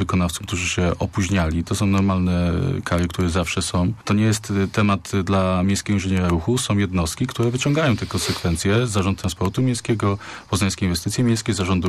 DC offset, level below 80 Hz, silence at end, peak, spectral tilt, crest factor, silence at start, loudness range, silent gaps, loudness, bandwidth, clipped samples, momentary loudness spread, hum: under 0.1%; -38 dBFS; 0 s; -10 dBFS; -5.5 dB/octave; 10 dB; 0 s; 1 LU; none; -21 LUFS; 14 kHz; under 0.1%; 4 LU; none